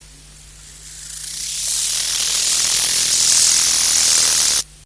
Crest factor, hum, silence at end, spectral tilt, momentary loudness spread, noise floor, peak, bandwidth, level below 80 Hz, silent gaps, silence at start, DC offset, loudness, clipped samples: 16 dB; none; 0.25 s; 2.5 dB/octave; 14 LU; -42 dBFS; -2 dBFS; 11 kHz; -46 dBFS; none; 0.1 s; under 0.1%; -13 LUFS; under 0.1%